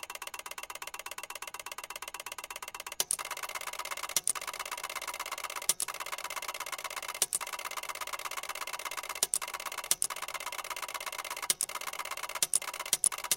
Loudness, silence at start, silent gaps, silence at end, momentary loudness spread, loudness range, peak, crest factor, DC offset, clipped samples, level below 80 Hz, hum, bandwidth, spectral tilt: -34 LUFS; 0 s; none; 0 s; 11 LU; 4 LU; -6 dBFS; 30 dB; under 0.1%; under 0.1%; -70 dBFS; none; 17 kHz; 2 dB/octave